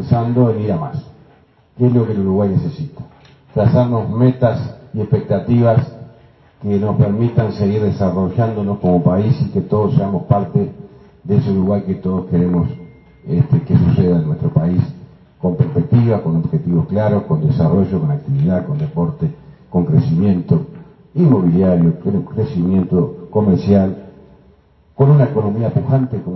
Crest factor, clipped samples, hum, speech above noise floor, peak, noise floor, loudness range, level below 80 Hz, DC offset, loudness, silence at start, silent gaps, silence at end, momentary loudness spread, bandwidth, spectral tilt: 16 dB; under 0.1%; none; 36 dB; 0 dBFS; -50 dBFS; 2 LU; -44 dBFS; under 0.1%; -16 LUFS; 0 s; none; 0 s; 9 LU; 6 kHz; -11.5 dB/octave